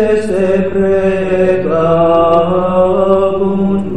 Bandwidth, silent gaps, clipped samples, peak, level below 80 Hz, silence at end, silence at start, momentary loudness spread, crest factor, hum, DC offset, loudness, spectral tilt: 9.6 kHz; none; under 0.1%; 0 dBFS; -36 dBFS; 0 s; 0 s; 4 LU; 12 dB; none; 4%; -12 LUFS; -8 dB/octave